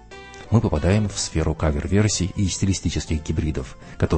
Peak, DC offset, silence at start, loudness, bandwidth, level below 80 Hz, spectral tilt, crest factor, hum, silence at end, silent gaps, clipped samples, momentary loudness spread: -4 dBFS; under 0.1%; 0.1 s; -22 LUFS; 8.8 kHz; -32 dBFS; -5.5 dB/octave; 18 dB; none; 0 s; none; under 0.1%; 9 LU